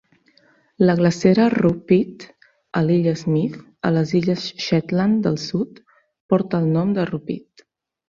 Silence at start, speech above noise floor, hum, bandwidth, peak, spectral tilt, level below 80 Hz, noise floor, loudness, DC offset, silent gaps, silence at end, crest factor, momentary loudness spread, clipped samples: 0.8 s; 39 dB; none; 7.4 kHz; -2 dBFS; -7.5 dB/octave; -56 dBFS; -58 dBFS; -20 LUFS; under 0.1%; 6.20-6.29 s; 0.7 s; 18 dB; 11 LU; under 0.1%